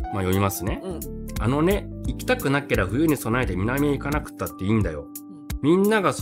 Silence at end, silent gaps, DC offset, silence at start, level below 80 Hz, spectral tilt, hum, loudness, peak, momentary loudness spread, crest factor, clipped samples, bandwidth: 0 s; none; under 0.1%; 0 s; -36 dBFS; -6 dB/octave; none; -24 LUFS; -8 dBFS; 12 LU; 16 dB; under 0.1%; 16 kHz